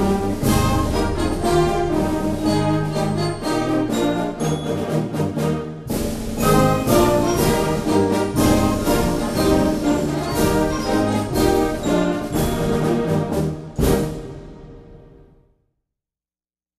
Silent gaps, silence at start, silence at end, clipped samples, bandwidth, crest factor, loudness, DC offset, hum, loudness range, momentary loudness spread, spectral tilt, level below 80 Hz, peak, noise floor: none; 0 s; 1.75 s; under 0.1%; 14 kHz; 18 dB; -20 LUFS; under 0.1%; none; 5 LU; 6 LU; -6 dB/octave; -32 dBFS; -2 dBFS; under -90 dBFS